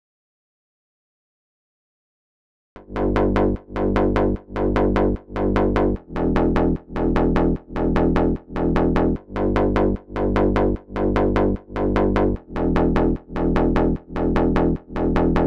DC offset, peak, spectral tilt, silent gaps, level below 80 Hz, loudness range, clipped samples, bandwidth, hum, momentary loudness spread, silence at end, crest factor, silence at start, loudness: 1%; -6 dBFS; -9 dB/octave; none; -28 dBFS; 3 LU; under 0.1%; 7 kHz; none; 5 LU; 0 s; 14 dB; 2.75 s; -21 LUFS